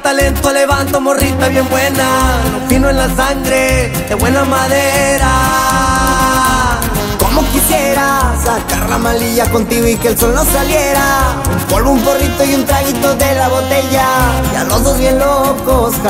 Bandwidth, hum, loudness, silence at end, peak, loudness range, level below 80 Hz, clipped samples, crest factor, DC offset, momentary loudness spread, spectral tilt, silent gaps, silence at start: 16.5 kHz; none; -11 LUFS; 0 s; 0 dBFS; 1 LU; -20 dBFS; under 0.1%; 12 dB; under 0.1%; 3 LU; -4 dB/octave; none; 0 s